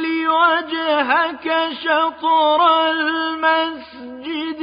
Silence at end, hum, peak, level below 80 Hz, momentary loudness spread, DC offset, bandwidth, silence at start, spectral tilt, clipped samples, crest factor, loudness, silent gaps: 0 s; none; -4 dBFS; -62 dBFS; 11 LU; under 0.1%; 5.2 kHz; 0 s; -7 dB/octave; under 0.1%; 14 dB; -17 LUFS; none